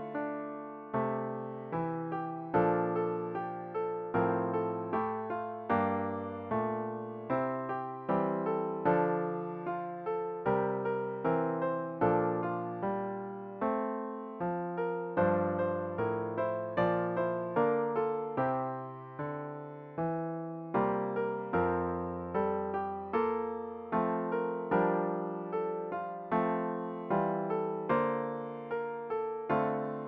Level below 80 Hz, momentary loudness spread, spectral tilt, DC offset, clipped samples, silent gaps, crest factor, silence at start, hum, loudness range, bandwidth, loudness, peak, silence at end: -66 dBFS; 8 LU; -7.5 dB/octave; under 0.1%; under 0.1%; none; 18 dB; 0 s; none; 2 LU; 4.6 kHz; -34 LUFS; -14 dBFS; 0 s